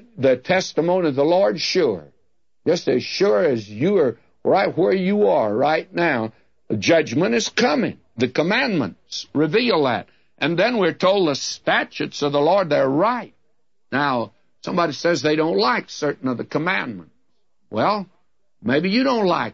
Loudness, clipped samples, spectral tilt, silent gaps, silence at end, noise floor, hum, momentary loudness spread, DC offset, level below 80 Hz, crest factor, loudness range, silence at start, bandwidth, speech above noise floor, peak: -20 LUFS; under 0.1%; -5 dB/octave; none; 0.05 s; -73 dBFS; none; 9 LU; 0.1%; -66 dBFS; 16 dB; 3 LU; 0.15 s; 7.8 kHz; 54 dB; -6 dBFS